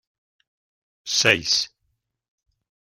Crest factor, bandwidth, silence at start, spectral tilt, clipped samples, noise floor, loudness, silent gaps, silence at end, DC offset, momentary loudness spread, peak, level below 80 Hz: 26 dB; 16 kHz; 1.05 s; -1 dB/octave; under 0.1%; -75 dBFS; -19 LUFS; none; 1.2 s; under 0.1%; 15 LU; -2 dBFS; -62 dBFS